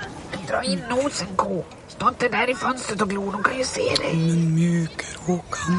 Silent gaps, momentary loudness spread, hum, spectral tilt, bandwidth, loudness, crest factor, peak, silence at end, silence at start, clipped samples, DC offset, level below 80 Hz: none; 8 LU; none; -5 dB/octave; 11.5 kHz; -23 LUFS; 20 dB; -4 dBFS; 0 s; 0 s; under 0.1%; under 0.1%; -50 dBFS